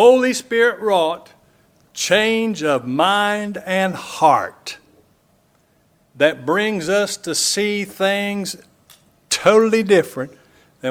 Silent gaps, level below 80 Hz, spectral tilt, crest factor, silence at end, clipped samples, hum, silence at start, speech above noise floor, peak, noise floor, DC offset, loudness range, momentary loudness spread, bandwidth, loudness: none; -62 dBFS; -3.5 dB/octave; 18 dB; 0 s; under 0.1%; none; 0 s; 42 dB; 0 dBFS; -59 dBFS; under 0.1%; 3 LU; 14 LU; 17.5 kHz; -18 LUFS